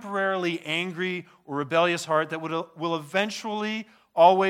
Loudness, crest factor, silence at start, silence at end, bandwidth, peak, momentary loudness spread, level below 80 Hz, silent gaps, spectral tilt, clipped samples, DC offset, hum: -26 LUFS; 20 dB; 0 s; 0 s; 15.5 kHz; -4 dBFS; 10 LU; -82 dBFS; none; -4.5 dB/octave; under 0.1%; under 0.1%; none